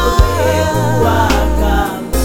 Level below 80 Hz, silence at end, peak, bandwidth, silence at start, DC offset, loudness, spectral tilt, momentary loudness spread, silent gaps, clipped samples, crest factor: -18 dBFS; 0 s; 0 dBFS; 17.5 kHz; 0 s; 3%; -14 LUFS; -5.5 dB/octave; 3 LU; none; 0.3%; 12 dB